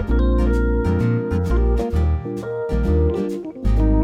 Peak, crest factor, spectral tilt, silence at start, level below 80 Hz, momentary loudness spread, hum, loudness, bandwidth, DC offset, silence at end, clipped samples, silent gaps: -6 dBFS; 12 dB; -9.5 dB/octave; 0 s; -20 dBFS; 7 LU; none; -21 LUFS; 7.2 kHz; under 0.1%; 0 s; under 0.1%; none